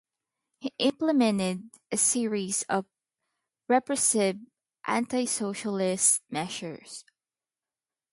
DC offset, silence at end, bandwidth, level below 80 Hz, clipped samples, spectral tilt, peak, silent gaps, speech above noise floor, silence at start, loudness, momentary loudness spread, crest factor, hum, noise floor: under 0.1%; 1.1 s; 12 kHz; -74 dBFS; under 0.1%; -3 dB/octave; -8 dBFS; none; over 63 dB; 0.6 s; -26 LUFS; 16 LU; 20 dB; none; under -90 dBFS